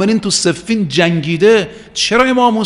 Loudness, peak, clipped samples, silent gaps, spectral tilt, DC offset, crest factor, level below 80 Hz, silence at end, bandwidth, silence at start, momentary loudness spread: -13 LUFS; 0 dBFS; under 0.1%; none; -4 dB/octave; under 0.1%; 12 dB; -46 dBFS; 0 s; 11.5 kHz; 0 s; 6 LU